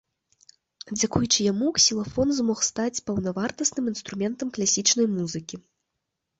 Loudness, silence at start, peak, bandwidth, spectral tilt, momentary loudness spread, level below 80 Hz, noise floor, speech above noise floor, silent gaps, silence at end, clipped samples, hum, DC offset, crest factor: -24 LUFS; 0.85 s; -6 dBFS; 8.2 kHz; -3 dB/octave; 10 LU; -54 dBFS; -82 dBFS; 57 dB; none; 0.8 s; under 0.1%; none; under 0.1%; 20 dB